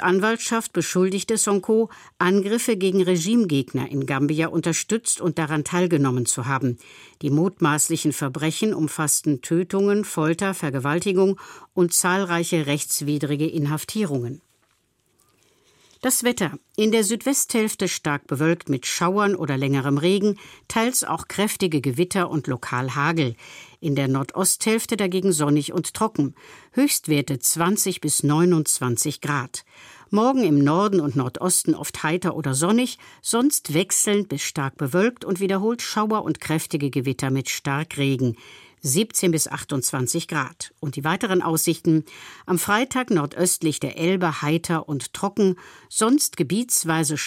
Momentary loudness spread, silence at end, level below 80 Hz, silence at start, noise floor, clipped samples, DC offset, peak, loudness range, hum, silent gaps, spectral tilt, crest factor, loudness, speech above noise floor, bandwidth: 7 LU; 0 s; -62 dBFS; 0 s; -67 dBFS; under 0.1%; under 0.1%; -4 dBFS; 3 LU; none; none; -4.5 dB/octave; 18 dB; -22 LUFS; 44 dB; 16.5 kHz